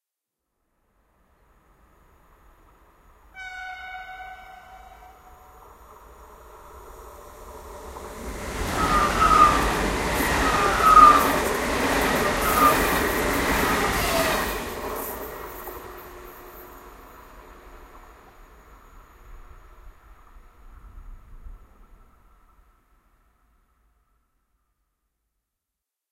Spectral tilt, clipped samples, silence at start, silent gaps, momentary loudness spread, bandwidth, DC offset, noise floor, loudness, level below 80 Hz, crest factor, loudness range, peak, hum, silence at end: -3.5 dB/octave; under 0.1%; 3.35 s; none; 27 LU; 16 kHz; under 0.1%; -86 dBFS; -20 LUFS; -40 dBFS; 24 dB; 25 LU; -2 dBFS; none; 4.55 s